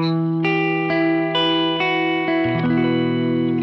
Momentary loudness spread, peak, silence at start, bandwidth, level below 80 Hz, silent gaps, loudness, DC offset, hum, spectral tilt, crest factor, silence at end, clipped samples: 2 LU; -8 dBFS; 0 s; 6 kHz; -58 dBFS; none; -19 LUFS; under 0.1%; none; -8 dB/octave; 12 dB; 0 s; under 0.1%